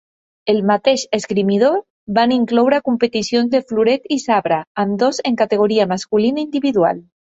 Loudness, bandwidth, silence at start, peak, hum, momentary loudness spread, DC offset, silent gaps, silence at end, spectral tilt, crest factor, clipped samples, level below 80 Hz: -17 LUFS; 8 kHz; 0.45 s; -2 dBFS; none; 4 LU; under 0.1%; 1.90-2.07 s, 4.67-4.75 s; 0.2 s; -5 dB/octave; 14 dB; under 0.1%; -58 dBFS